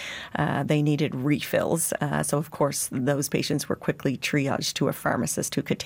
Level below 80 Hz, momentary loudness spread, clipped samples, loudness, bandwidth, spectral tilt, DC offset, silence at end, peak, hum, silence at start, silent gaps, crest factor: -60 dBFS; 4 LU; under 0.1%; -26 LUFS; 17 kHz; -4.5 dB/octave; under 0.1%; 0 s; -10 dBFS; none; 0 s; none; 16 dB